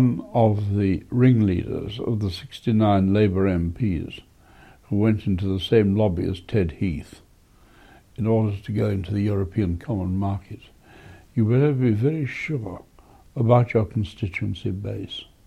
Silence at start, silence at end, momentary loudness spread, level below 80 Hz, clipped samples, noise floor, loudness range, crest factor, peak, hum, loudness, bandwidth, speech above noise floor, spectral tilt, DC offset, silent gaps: 0 s; 0.25 s; 12 LU; -44 dBFS; under 0.1%; -54 dBFS; 4 LU; 18 dB; -4 dBFS; none; -23 LUFS; 9.2 kHz; 32 dB; -9 dB/octave; under 0.1%; none